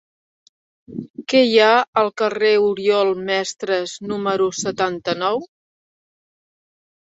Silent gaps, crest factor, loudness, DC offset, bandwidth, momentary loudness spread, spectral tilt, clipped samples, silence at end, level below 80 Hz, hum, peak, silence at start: 1.10-1.14 s, 1.88-1.93 s; 18 dB; -18 LUFS; under 0.1%; 8 kHz; 12 LU; -3.5 dB/octave; under 0.1%; 1.55 s; -64 dBFS; none; -2 dBFS; 0.9 s